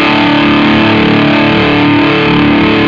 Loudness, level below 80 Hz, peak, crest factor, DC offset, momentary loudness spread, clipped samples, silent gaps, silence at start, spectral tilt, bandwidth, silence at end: -7 LUFS; -32 dBFS; 0 dBFS; 8 dB; under 0.1%; 1 LU; under 0.1%; none; 0 s; -7 dB/octave; 7.2 kHz; 0 s